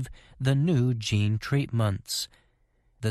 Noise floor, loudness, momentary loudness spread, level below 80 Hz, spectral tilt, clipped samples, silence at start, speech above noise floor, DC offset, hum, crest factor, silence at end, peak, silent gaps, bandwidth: -67 dBFS; -27 LUFS; 9 LU; -54 dBFS; -5.5 dB/octave; under 0.1%; 0 s; 41 dB; under 0.1%; none; 16 dB; 0 s; -12 dBFS; none; 13.5 kHz